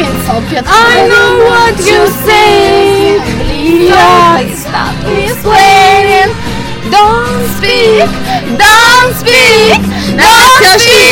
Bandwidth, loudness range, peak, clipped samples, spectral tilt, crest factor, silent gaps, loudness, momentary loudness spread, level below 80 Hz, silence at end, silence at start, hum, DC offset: over 20 kHz; 3 LU; 0 dBFS; 2%; -3 dB/octave; 6 dB; none; -5 LUFS; 11 LU; -26 dBFS; 0 s; 0 s; none; under 0.1%